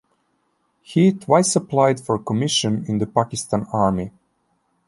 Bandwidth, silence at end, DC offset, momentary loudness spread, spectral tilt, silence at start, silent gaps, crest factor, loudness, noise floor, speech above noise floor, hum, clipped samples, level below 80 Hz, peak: 11.5 kHz; 0.8 s; under 0.1%; 7 LU; -5 dB/octave; 0.9 s; none; 18 dB; -20 LUFS; -68 dBFS; 48 dB; none; under 0.1%; -52 dBFS; -2 dBFS